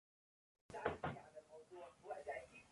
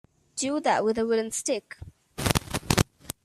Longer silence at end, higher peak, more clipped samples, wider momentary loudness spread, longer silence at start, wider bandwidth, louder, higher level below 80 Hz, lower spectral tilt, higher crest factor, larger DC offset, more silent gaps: second, 0 s vs 0.15 s; second, -24 dBFS vs 0 dBFS; neither; about the same, 15 LU vs 15 LU; first, 0.7 s vs 0.35 s; second, 11.5 kHz vs 15.5 kHz; second, -50 LUFS vs -27 LUFS; second, -72 dBFS vs -46 dBFS; first, -6 dB/octave vs -4 dB/octave; about the same, 26 dB vs 28 dB; neither; neither